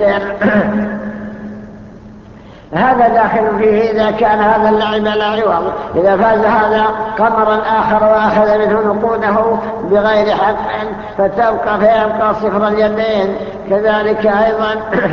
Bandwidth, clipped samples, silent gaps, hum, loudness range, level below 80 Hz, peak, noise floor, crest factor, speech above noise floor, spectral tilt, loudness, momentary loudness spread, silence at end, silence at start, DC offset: 6.6 kHz; under 0.1%; none; none; 3 LU; -40 dBFS; 0 dBFS; -36 dBFS; 12 dB; 23 dB; -7.5 dB/octave; -13 LUFS; 8 LU; 0 s; 0 s; under 0.1%